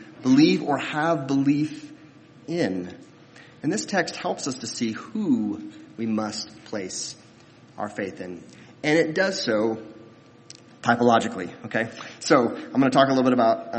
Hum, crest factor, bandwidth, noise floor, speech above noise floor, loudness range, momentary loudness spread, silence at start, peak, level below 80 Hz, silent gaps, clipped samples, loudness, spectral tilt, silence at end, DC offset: none; 22 dB; 8.8 kHz; -51 dBFS; 27 dB; 7 LU; 16 LU; 0 s; -2 dBFS; -68 dBFS; none; under 0.1%; -24 LUFS; -5 dB/octave; 0 s; under 0.1%